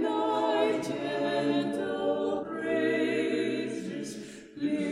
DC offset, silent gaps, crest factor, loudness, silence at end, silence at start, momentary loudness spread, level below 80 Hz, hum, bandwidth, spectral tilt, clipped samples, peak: under 0.1%; none; 14 dB; -30 LUFS; 0 s; 0 s; 9 LU; -72 dBFS; none; 12.5 kHz; -5 dB/octave; under 0.1%; -16 dBFS